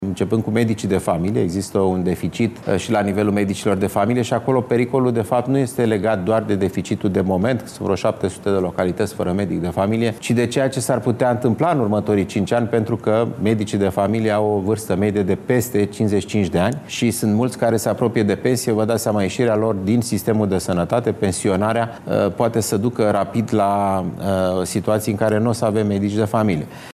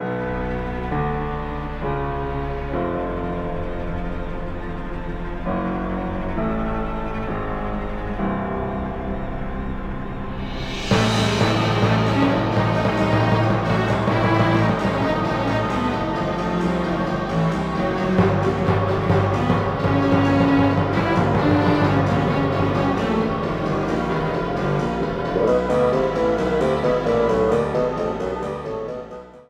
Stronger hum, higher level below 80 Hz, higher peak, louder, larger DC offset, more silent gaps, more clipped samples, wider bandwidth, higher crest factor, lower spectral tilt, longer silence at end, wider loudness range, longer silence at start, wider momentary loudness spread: neither; second, -54 dBFS vs -34 dBFS; about the same, -4 dBFS vs -4 dBFS; about the same, -19 LUFS vs -21 LUFS; neither; neither; neither; first, 15.5 kHz vs 11 kHz; about the same, 14 dB vs 16 dB; about the same, -6.5 dB/octave vs -7 dB/octave; about the same, 0 s vs 0.05 s; second, 1 LU vs 8 LU; about the same, 0 s vs 0 s; second, 3 LU vs 11 LU